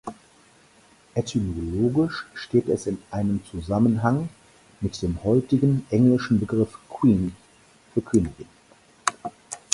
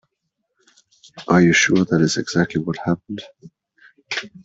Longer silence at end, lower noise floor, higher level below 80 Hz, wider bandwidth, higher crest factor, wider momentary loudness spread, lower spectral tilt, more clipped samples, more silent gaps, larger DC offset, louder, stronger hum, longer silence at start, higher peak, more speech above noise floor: about the same, 0.15 s vs 0.05 s; second, -56 dBFS vs -76 dBFS; first, -46 dBFS vs -56 dBFS; first, 11.5 kHz vs 8 kHz; first, 24 dB vs 18 dB; second, 12 LU vs 17 LU; first, -7 dB/octave vs -5 dB/octave; neither; neither; neither; second, -24 LUFS vs -18 LUFS; neither; second, 0.05 s vs 1.15 s; about the same, -2 dBFS vs -2 dBFS; second, 33 dB vs 58 dB